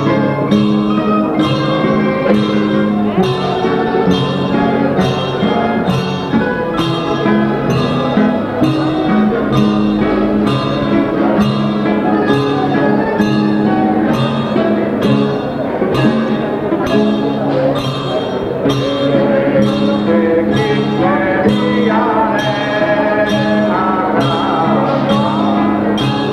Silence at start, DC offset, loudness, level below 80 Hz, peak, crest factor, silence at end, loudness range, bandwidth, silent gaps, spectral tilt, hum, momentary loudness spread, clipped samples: 0 s; under 0.1%; -14 LUFS; -40 dBFS; 0 dBFS; 14 dB; 0 s; 2 LU; 12.5 kHz; none; -7.5 dB/octave; none; 3 LU; under 0.1%